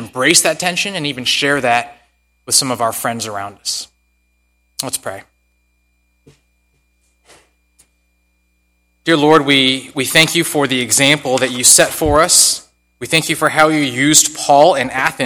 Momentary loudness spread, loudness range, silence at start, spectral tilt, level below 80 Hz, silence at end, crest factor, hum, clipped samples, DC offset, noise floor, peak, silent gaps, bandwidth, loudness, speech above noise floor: 14 LU; 19 LU; 0 s; -2 dB/octave; -44 dBFS; 0 s; 16 dB; 60 Hz at -60 dBFS; 0.3%; under 0.1%; -61 dBFS; 0 dBFS; none; over 20 kHz; -13 LUFS; 48 dB